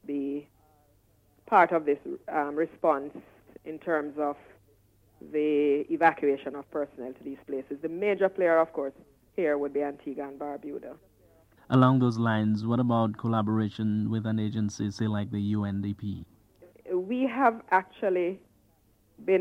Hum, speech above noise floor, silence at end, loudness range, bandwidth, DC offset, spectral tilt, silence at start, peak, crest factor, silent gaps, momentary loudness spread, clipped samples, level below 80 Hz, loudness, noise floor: none; 37 dB; 0 s; 5 LU; 10 kHz; under 0.1%; -8 dB/octave; 0.05 s; -8 dBFS; 22 dB; none; 14 LU; under 0.1%; -68 dBFS; -28 LUFS; -65 dBFS